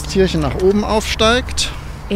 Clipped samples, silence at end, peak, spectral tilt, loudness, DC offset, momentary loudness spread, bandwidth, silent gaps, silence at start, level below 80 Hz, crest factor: under 0.1%; 0 s; -2 dBFS; -4.5 dB/octave; -16 LUFS; under 0.1%; 7 LU; 16 kHz; none; 0 s; -26 dBFS; 14 dB